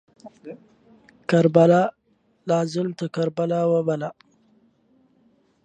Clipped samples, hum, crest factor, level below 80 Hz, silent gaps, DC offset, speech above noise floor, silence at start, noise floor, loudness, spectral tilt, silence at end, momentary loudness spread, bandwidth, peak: under 0.1%; none; 22 dB; -70 dBFS; none; under 0.1%; 44 dB; 0.25 s; -65 dBFS; -21 LUFS; -7.5 dB/octave; 1.5 s; 24 LU; 9 kHz; -2 dBFS